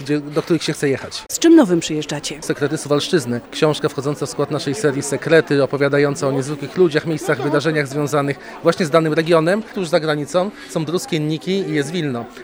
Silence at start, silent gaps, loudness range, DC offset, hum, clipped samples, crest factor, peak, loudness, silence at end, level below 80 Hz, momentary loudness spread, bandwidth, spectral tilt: 0 s; none; 2 LU; under 0.1%; none; under 0.1%; 18 dB; 0 dBFS; -18 LUFS; 0 s; -56 dBFS; 8 LU; over 20 kHz; -5 dB/octave